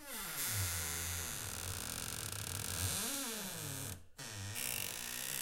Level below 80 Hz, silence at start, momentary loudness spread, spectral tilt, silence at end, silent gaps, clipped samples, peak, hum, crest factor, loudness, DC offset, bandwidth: -60 dBFS; 0 s; 7 LU; -2 dB/octave; 0 s; none; under 0.1%; -22 dBFS; none; 20 dB; -39 LUFS; under 0.1%; 17 kHz